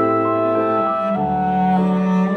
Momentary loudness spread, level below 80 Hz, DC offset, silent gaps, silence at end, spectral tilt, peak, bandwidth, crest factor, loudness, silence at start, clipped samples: 2 LU; -48 dBFS; under 0.1%; none; 0 s; -9.5 dB/octave; -6 dBFS; 6.2 kHz; 12 dB; -18 LUFS; 0 s; under 0.1%